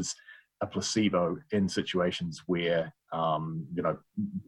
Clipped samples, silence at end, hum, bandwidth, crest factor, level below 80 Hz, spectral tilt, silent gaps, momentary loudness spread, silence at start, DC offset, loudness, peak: under 0.1%; 0.05 s; none; 12 kHz; 16 dB; -64 dBFS; -5 dB/octave; none; 8 LU; 0 s; under 0.1%; -31 LUFS; -14 dBFS